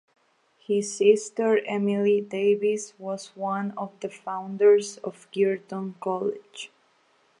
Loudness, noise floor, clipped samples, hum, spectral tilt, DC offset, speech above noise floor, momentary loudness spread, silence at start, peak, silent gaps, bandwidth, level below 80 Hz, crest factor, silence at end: -25 LUFS; -64 dBFS; under 0.1%; none; -5 dB/octave; under 0.1%; 40 dB; 14 LU; 0.7 s; -6 dBFS; none; 11 kHz; -82 dBFS; 18 dB; 0.75 s